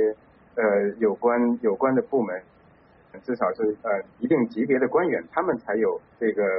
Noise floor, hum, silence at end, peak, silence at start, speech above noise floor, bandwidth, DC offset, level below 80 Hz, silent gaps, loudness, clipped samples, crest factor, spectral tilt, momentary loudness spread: -55 dBFS; none; 0 s; -10 dBFS; 0 s; 32 dB; 5.4 kHz; under 0.1%; -66 dBFS; none; -24 LUFS; under 0.1%; 14 dB; -7 dB/octave; 7 LU